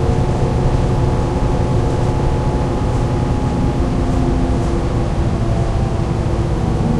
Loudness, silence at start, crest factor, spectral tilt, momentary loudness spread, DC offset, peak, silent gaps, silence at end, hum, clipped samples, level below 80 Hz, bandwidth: -18 LUFS; 0 s; 12 dB; -8 dB/octave; 2 LU; under 0.1%; -2 dBFS; none; 0 s; none; under 0.1%; -20 dBFS; 11.5 kHz